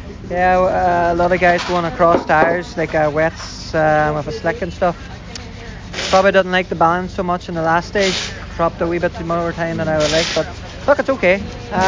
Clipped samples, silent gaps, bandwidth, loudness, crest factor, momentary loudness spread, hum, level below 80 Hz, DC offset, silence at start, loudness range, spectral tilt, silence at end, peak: under 0.1%; none; 7.6 kHz; -17 LUFS; 16 dB; 11 LU; none; -36 dBFS; under 0.1%; 0 s; 4 LU; -5 dB/octave; 0 s; -2 dBFS